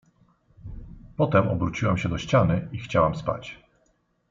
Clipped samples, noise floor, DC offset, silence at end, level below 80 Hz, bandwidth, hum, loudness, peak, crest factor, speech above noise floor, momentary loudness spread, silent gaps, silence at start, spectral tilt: under 0.1%; -68 dBFS; under 0.1%; 0.75 s; -46 dBFS; 7.6 kHz; none; -24 LUFS; -6 dBFS; 20 dB; 44 dB; 21 LU; none; 0.65 s; -7.5 dB/octave